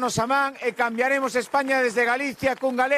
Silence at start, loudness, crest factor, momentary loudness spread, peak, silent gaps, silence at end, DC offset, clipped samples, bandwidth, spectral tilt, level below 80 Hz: 0 s; -23 LUFS; 14 dB; 4 LU; -8 dBFS; none; 0 s; under 0.1%; under 0.1%; 14.5 kHz; -4 dB/octave; -60 dBFS